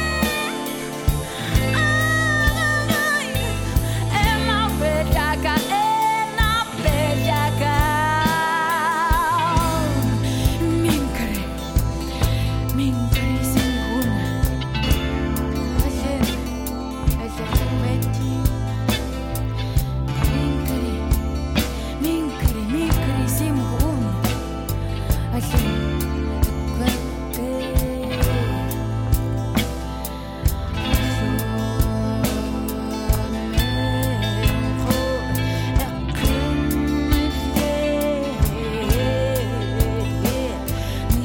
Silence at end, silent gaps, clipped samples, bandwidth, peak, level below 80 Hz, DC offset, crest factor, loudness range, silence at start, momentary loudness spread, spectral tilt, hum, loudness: 0 s; none; under 0.1%; 17.5 kHz; -6 dBFS; -26 dBFS; under 0.1%; 14 dB; 4 LU; 0 s; 6 LU; -5.5 dB/octave; none; -22 LUFS